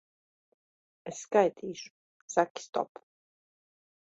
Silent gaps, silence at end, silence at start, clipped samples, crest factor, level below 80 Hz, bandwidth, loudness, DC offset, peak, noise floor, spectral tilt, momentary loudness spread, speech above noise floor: 1.90-2.28 s, 2.50-2.55 s, 2.69-2.73 s; 1.2 s; 1.05 s; under 0.1%; 24 dB; -80 dBFS; 8.2 kHz; -31 LUFS; under 0.1%; -10 dBFS; under -90 dBFS; -4 dB/octave; 18 LU; over 59 dB